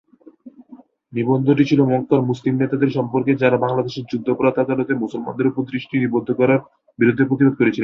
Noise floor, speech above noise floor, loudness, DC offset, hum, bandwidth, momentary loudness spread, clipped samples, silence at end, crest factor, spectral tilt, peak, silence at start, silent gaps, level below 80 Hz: -46 dBFS; 28 dB; -19 LUFS; under 0.1%; none; 7 kHz; 7 LU; under 0.1%; 0 s; 16 dB; -8.5 dB/octave; -2 dBFS; 0.45 s; none; -58 dBFS